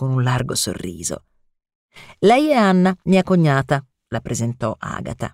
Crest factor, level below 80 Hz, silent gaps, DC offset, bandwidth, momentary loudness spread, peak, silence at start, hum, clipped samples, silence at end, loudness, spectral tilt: 16 dB; -48 dBFS; 1.75-1.89 s; under 0.1%; 15.5 kHz; 13 LU; -4 dBFS; 0 s; none; under 0.1%; 0.05 s; -19 LUFS; -5.5 dB/octave